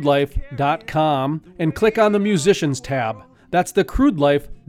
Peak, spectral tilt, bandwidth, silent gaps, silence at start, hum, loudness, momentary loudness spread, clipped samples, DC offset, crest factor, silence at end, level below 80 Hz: -4 dBFS; -6 dB/octave; 16 kHz; none; 0 s; none; -19 LUFS; 8 LU; under 0.1%; under 0.1%; 16 dB; 0.15 s; -36 dBFS